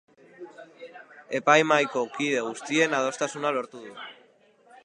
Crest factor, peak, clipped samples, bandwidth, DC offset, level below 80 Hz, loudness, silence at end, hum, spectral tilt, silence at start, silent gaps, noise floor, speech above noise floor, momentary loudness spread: 24 dB; -4 dBFS; under 0.1%; 11 kHz; under 0.1%; -82 dBFS; -25 LUFS; 0.75 s; none; -3.5 dB/octave; 0.4 s; none; -59 dBFS; 34 dB; 25 LU